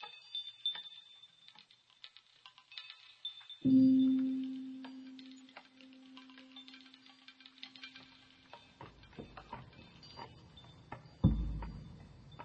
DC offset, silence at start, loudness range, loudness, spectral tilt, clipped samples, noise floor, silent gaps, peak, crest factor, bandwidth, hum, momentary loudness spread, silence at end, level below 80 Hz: under 0.1%; 0 s; 20 LU; -34 LUFS; -7.5 dB/octave; under 0.1%; -64 dBFS; none; -16 dBFS; 24 dB; 6.6 kHz; none; 26 LU; 0 s; -52 dBFS